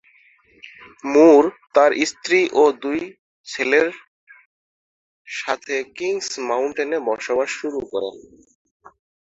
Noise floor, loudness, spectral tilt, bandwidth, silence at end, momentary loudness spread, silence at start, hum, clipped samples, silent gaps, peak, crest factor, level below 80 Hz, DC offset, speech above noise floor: -55 dBFS; -19 LUFS; -3 dB/octave; 8 kHz; 1.15 s; 14 LU; 0.65 s; none; under 0.1%; 3.19-3.44 s, 4.08-4.27 s, 4.46-5.25 s; -2 dBFS; 20 dB; -64 dBFS; under 0.1%; 36 dB